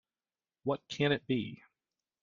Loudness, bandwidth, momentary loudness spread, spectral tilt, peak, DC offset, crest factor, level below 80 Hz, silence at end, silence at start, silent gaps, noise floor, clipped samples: -34 LUFS; 7.4 kHz; 12 LU; -6 dB/octave; -16 dBFS; under 0.1%; 20 dB; -72 dBFS; 0.65 s; 0.65 s; none; under -90 dBFS; under 0.1%